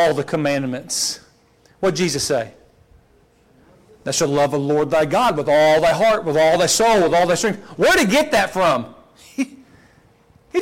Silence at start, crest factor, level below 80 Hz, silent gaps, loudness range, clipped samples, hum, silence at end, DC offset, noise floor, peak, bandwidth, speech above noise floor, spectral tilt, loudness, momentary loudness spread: 0 s; 12 dB; -50 dBFS; none; 8 LU; under 0.1%; none; 0 s; under 0.1%; -55 dBFS; -8 dBFS; 16.5 kHz; 38 dB; -3.5 dB/octave; -18 LUFS; 12 LU